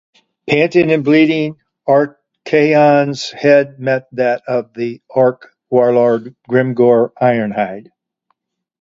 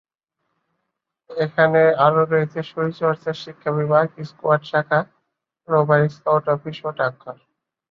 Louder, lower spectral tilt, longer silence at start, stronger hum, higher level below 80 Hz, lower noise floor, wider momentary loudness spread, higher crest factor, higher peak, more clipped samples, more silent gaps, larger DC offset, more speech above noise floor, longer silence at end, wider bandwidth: first, -14 LUFS vs -20 LUFS; about the same, -7 dB/octave vs -8 dB/octave; second, 0.45 s vs 1.3 s; neither; first, -60 dBFS vs -66 dBFS; second, -67 dBFS vs -78 dBFS; about the same, 11 LU vs 13 LU; second, 14 dB vs 20 dB; about the same, 0 dBFS vs -2 dBFS; neither; neither; neither; second, 54 dB vs 59 dB; first, 1 s vs 0.6 s; first, 7.8 kHz vs 6.8 kHz